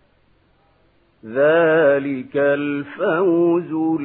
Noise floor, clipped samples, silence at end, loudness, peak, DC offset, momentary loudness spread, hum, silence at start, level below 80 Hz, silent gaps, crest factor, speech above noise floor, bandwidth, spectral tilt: -58 dBFS; under 0.1%; 0 s; -18 LUFS; -4 dBFS; under 0.1%; 9 LU; none; 1.25 s; -66 dBFS; none; 14 dB; 40 dB; 4 kHz; -11.5 dB/octave